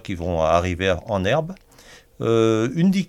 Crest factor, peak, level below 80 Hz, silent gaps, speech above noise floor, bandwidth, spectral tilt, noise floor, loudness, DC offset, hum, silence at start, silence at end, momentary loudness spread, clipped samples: 18 dB; -4 dBFS; -42 dBFS; none; 28 dB; 13 kHz; -6.5 dB/octave; -48 dBFS; -21 LUFS; under 0.1%; none; 0.05 s; 0.05 s; 9 LU; under 0.1%